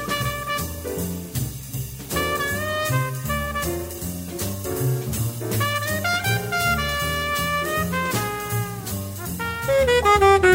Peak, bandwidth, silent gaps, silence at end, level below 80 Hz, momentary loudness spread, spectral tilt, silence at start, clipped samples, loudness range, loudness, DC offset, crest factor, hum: -4 dBFS; 16.5 kHz; none; 0 s; -40 dBFS; 11 LU; -4.5 dB/octave; 0 s; under 0.1%; 3 LU; -23 LUFS; under 0.1%; 20 dB; none